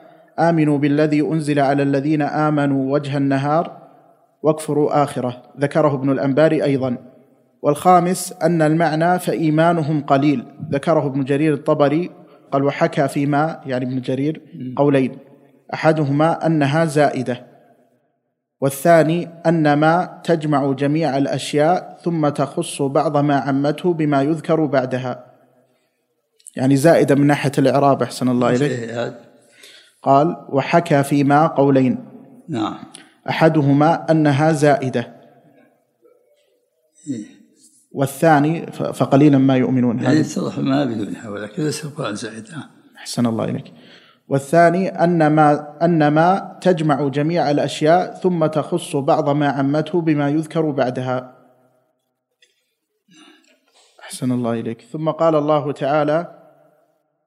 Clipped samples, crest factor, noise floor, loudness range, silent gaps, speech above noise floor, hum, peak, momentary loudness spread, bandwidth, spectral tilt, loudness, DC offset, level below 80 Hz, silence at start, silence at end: under 0.1%; 18 dB; -72 dBFS; 6 LU; none; 55 dB; none; 0 dBFS; 12 LU; 15.5 kHz; -7 dB/octave; -18 LUFS; under 0.1%; -70 dBFS; 0.35 s; 1 s